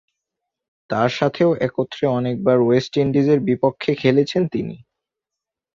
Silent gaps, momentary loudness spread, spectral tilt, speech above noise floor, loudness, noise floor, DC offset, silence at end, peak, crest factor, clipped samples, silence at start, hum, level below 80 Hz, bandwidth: none; 6 LU; -7.5 dB/octave; 67 dB; -19 LUFS; -86 dBFS; under 0.1%; 1 s; -2 dBFS; 18 dB; under 0.1%; 0.9 s; none; -58 dBFS; 7.6 kHz